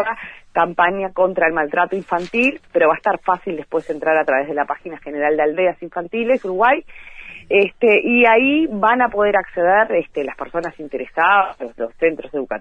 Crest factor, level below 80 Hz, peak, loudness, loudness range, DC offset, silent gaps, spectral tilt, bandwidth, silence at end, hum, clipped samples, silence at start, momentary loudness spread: 16 dB; -52 dBFS; -2 dBFS; -17 LUFS; 4 LU; under 0.1%; none; -6.5 dB/octave; 8.4 kHz; 0 s; none; under 0.1%; 0 s; 11 LU